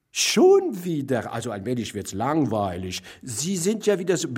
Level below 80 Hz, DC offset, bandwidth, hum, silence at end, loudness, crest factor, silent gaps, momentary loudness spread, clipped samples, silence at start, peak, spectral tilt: -60 dBFS; under 0.1%; 16 kHz; none; 0 s; -23 LUFS; 16 dB; none; 13 LU; under 0.1%; 0.15 s; -8 dBFS; -4.5 dB/octave